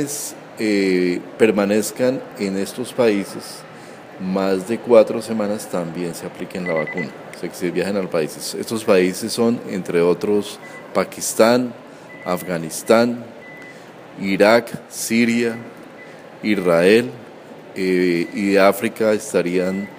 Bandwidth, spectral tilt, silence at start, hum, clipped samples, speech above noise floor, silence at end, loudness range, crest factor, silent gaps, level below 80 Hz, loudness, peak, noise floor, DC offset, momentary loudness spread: 15.5 kHz; -5 dB/octave; 0 s; none; under 0.1%; 20 dB; 0 s; 4 LU; 20 dB; none; -64 dBFS; -19 LUFS; 0 dBFS; -39 dBFS; under 0.1%; 21 LU